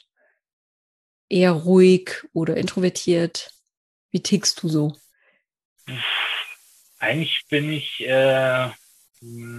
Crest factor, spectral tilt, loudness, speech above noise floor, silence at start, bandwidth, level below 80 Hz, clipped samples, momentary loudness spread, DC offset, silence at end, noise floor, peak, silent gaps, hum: 18 dB; -5 dB/octave; -21 LUFS; 47 dB; 1.3 s; 13 kHz; -66 dBFS; under 0.1%; 13 LU; under 0.1%; 0 s; -67 dBFS; -4 dBFS; 3.77-4.09 s, 5.65-5.76 s; none